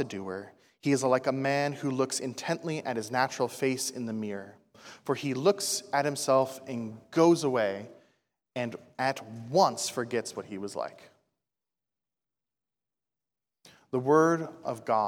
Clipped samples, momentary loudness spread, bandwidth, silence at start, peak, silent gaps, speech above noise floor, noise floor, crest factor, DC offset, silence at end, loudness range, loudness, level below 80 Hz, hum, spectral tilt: under 0.1%; 13 LU; 17.5 kHz; 0 s; -10 dBFS; none; over 61 dB; under -90 dBFS; 20 dB; under 0.1%; 0 s; 10 LU; -29 LUFS; -80 dBFS; none; -4.5 dB/octave